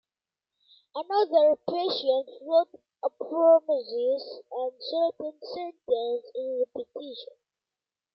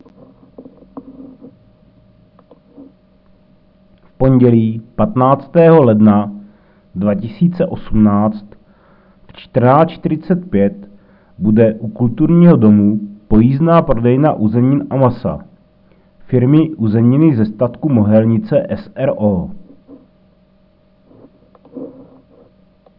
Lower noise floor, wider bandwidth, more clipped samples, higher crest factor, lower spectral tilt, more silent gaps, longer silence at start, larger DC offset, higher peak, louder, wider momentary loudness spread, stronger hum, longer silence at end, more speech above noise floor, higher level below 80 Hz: first, under -90 dBFS vs -51 dBFS; first, 5.8 kHz vs 4.9 kHz; neither; about the same, 18 dB vs 14 dB; second, -6 dB/octave vs -13.5 dB/octave; neither; first, 0.95 s vs 0.6 s; neither; second, -10 dBFS vs 0 dBFS; second, -27 LUFS vs -13 LUFS; first, 17 LU vs 13 LU; neither; second, 0.9 s vs 1.1 s; first, over 63 dB vs 40 dB; second, -82 dBFS vs -36 dBFS